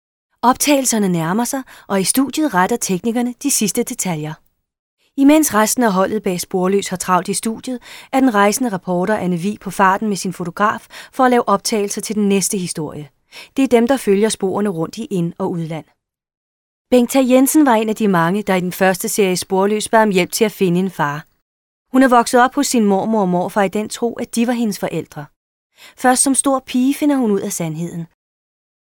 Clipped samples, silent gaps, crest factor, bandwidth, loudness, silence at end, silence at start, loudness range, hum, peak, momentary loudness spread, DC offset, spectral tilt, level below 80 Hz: under 0.1%; 4.79-4.97 s, 16.37-16.85 s, 21.42-21.85 s, 25.36-25.70 s; 16 dB; 19.5 kHz; -16 LUFS; 0.75 s; 0.45 s; 3 LU; none; 0 dBFS; 11 LU; under 0.1%; -4.5 dB/octave; -56 dBFS